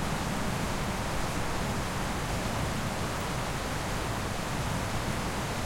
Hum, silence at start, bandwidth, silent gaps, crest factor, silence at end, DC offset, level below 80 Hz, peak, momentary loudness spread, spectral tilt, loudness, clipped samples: none; 0 s; 16.5 kHz; none; 12 dB; 0 s; under 0.1%; -40 dBFS; -18 dBFS; 1 LU; -4.5 dB/octave; -32 LUFS; under 0.1%